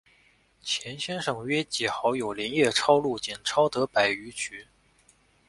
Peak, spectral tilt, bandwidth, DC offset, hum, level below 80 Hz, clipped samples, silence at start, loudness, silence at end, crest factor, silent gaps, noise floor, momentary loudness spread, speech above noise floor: -6 dBFS; -3 dB/octave; 11.5 kHz; under 0.1%; none; -64 dBFS; under 0.1%; 0.65 s; -26 LUFS; 0.85 s; 22 dB; none; -63 dBFS; 11 LU; 36 dB